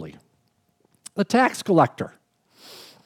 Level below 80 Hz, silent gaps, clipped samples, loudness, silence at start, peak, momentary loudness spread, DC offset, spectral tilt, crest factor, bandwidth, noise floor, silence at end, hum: -70 dBFS; none; under 0.1%; -21 LUFS; 0 s; -6 dBFS; 23 LU; under 0.1%; -5.5 dB/octave; 20 dB; 17 kHz; -67 dBFS; 0.3 s; none